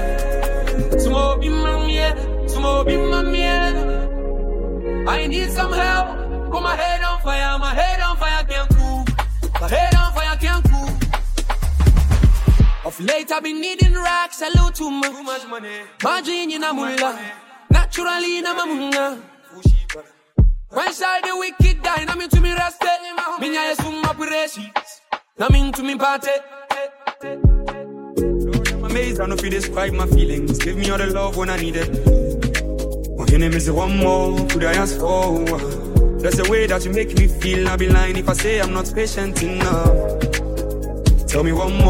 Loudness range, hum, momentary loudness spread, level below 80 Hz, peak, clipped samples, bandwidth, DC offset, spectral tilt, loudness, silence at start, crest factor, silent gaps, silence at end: 3 LU; none; 8 LU; -20 dBFS; 0 dBFS; under 0.1%; 16.5 kHz; under 0.1%; -5 dB/octave; -19 LUFS; 0 s; 16 dB; none; 0 s